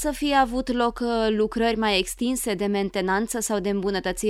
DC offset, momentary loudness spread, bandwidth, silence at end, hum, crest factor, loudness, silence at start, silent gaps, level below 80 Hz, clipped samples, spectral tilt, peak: under 0.1%; 4 LU; 16 kHz; 0 s; none; 16 dB; -24 LUFS; 0 s; none; -44 dBFS; under 0.1%; -4 dB/octave; -8 dBFS